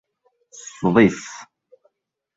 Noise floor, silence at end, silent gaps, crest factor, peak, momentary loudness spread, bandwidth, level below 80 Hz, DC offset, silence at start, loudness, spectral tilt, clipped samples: -71 dBFS; 0.95 s; none; 22 dB; -2 dBFS; 23 LU; 8 kHz; -56 dBFS; under 0.1%; 0.8 s; -18 LUFS; -6 dB/octave; under 0.1%